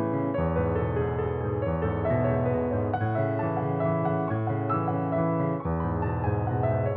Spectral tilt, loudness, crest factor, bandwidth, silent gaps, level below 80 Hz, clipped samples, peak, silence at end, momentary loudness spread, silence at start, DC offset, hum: -9 dB/octave; -27 LUFS; 12 dB; 4 kHz; none; -42 dBFS; under 0.1%; -14 dBFS; 0 s; 2 LU; 0 s; under 0.1%; none